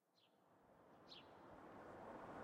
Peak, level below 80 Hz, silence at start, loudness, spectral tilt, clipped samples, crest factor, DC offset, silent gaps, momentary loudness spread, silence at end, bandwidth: -42 dBFS; -82 dBFS; 0.05 s; -60 LUFS; -5.5 dB/octave; under 0.1%; 18 dB; under 0.1%; none; 9 LU; 0 s; 10.5 kHz